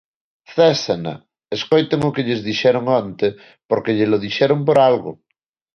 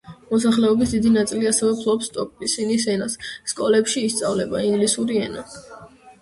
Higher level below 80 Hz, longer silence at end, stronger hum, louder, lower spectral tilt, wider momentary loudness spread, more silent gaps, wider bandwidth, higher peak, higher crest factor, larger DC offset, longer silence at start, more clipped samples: second, -58 dBFS vs -52 dBFS; first, 0.6 s vs 0.1 s; neither; first, -18 LUFS vs -21 LUFS; first, -6 dB/octave vs -4 dB/octave; about the same, 12 LU vs 10 LU; first, 3.65-3.69 s vs none; second, 7 kHz vs 11.5 kHz; first, -2 dBFS vs -6 dBFS; about the same, 16 dB vs 14 dB; neither; first, 0.5 s vs 0.05 s; neither